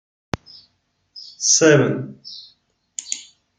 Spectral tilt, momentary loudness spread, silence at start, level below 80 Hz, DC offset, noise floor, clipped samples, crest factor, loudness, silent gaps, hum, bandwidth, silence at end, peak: -3 dB/octave; 25 LU; 1.15 s; -54 dBFS; under 0.1%; -67 dBFS; under 0.1%; 20 dB; -17 LUFS; none; none; 10.5 kHz; 0.35 s; -2 dBFS